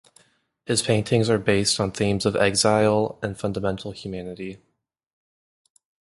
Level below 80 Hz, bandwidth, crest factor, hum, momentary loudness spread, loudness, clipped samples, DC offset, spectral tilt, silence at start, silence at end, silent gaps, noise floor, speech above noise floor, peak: -50 dBFS; 11.5 kHz; 20 dB; none; 15 LU; -22 LUFS; under 0.1%; under 0.1%; -4.5 dB/octave; 0.7 s; 1.6 s; none; -63 dBFS; 40 dB; -4 dBFS